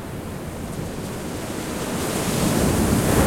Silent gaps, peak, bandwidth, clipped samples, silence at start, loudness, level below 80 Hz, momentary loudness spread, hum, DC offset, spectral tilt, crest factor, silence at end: none; -6 dBFS; 16.5 kHz; under 0.1%; 0 s; -24 LUFS; -36 dBFS; 12 LU; none; under 0.1%; -5 dB/octave; 18 dB; 0 s